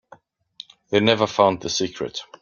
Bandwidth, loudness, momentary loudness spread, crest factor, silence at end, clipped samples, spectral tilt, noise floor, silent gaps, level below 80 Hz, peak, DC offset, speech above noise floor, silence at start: 7.4 kHz; -21 LUFS; 24 LU; 22 dB; 0.15 s; under 0.1%; -4 dB/octave; -52 dBFS; none; -60 dBFS; -2 dBFS; under 0.1%; 31 dB; 0.9 s